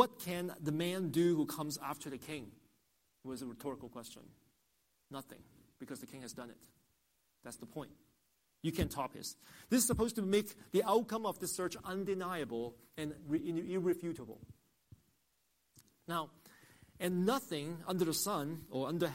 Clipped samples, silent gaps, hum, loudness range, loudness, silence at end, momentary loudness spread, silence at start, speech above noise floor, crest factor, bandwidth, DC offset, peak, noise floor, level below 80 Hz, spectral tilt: under 0.1%; none; none; 16 LU; -38 LUFS; 0 s; 18 LU; 0 s; 41 dB; 26 dB; 16 kHz; under 0.1%; -14 dBFS; -79 dBFS; -62 dBFS; -4.5 dB/octave